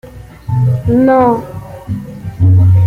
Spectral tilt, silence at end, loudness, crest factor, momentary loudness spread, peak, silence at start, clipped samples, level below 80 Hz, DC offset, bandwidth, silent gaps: -10.5 dB/octave; 0 s; -12 LUFS; 10 dB; 18 LU; -2 dBFS; 0.05 s; under 0.1%; -36 dBFS; under 0.1%; 4.1 kHz; none